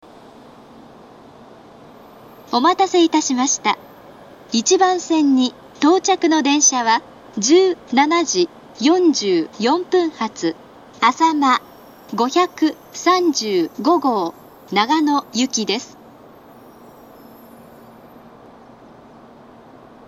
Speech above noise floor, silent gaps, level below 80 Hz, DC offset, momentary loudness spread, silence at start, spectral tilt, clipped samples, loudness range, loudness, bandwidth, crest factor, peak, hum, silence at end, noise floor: 27 dB; none; -64 dBFS; under 0.1%; 8 LU; 2.5 s; -2.5 dB/octave; under 0.1%; 6 LU; -17 LUFS; 14.5 kHz; 20 dB; 0 dBFS; none; 4.2 s; -43 dBFS